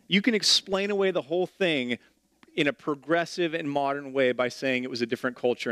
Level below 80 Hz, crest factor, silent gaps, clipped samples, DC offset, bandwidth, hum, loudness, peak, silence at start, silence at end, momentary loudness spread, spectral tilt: -72 dBFS; 18 dB; none; under 0.1%; under 0.1%; 15 kHz; none; -26 LUFS; -8 dBFS; 0.1 s; 0 s; 8 LU; -3.5 dB/octave